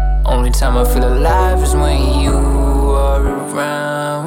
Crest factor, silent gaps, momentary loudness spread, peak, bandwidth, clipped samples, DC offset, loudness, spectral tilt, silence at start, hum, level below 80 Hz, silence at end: 10 dB; none; 5 LU; -2 dBFS; 17 kHz; under 0.1%; under 0.1%; -15 LUFS; -6 dB/octave; 0 s; none; -14 dBFS; 0 s